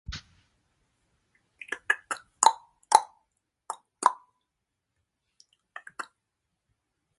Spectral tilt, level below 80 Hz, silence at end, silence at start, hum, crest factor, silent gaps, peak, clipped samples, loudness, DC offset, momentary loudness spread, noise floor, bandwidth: 0 dB/octave; -58 dBFS; 1.15 s; 0.1 s; none; 32 dB; none; 0 dBFS; under 0.1%; -26 LUFS; under 0.1%; 23 LU; -83 dBFS; 11.5 kHz